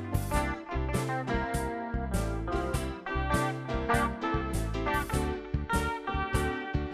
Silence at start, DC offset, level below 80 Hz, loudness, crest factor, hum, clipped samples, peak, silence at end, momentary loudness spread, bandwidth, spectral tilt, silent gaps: 0 s; under 0.1%; -36 dBFS; -32 LUFS; 18 dB; none; under 0.1%; -14 dBFS; 0 s; 4 LU; 15.5 kHz; -5.5 dB/octave; none